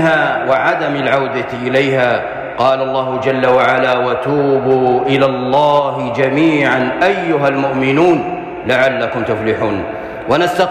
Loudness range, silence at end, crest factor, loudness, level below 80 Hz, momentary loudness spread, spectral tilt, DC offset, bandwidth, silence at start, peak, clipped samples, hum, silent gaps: 2 LU; 0 s; 10 dB; -14 LUFS; -48 dBFS; 6 LU; -6.5 dB/octave; under 0.1%; 14.5 kHz; 0 s; -2 dBFS; under 0.1%; none; none